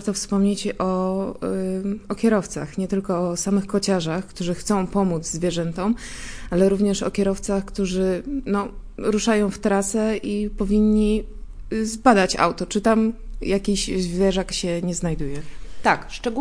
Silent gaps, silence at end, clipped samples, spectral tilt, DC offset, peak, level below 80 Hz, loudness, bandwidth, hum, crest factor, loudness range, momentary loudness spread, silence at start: none; 0 s; under 0.1%; -5 dB/octave; under 0.1%; 0 dBFS; -38 dBFS; -22 LUFS; 10.5 kHz; none; 22 dB; 3 LU; 9 LU; 0 s